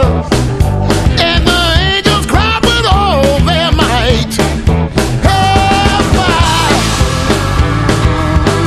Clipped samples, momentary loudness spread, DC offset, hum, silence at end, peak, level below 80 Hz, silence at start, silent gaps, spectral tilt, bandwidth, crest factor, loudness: under 0.1%; 3 LU; under 0.1%; none; 0 s; 0 dBFS; -16 dBFS; 0 s; none; -5 dB/octave; 13 kHz; 10 dB; -10 LUFS